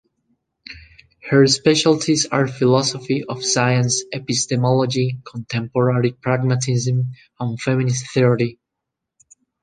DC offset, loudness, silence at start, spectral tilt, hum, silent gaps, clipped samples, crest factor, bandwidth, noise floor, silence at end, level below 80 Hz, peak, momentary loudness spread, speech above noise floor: under 0.1%; -19 LUFS; 0.7 s; -5 dB/octave; none; none; under 0.1%; 18 dB; 9.8 kHz; -81 dBFS; 1.1 s; -58 dBFS; -2 dBFS; 11 LU; 63 dB